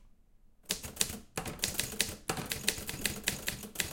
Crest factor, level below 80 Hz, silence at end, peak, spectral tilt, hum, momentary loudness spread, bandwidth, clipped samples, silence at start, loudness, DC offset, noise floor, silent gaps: 32 dB; -54 dBFS; 0 s; -6 dBFS; -1.5 dB/octave; none; 5 LU; 17 kHz; under 0.1%; 0 s; -35 LUFS; under 0.1%; -61 dBFS; none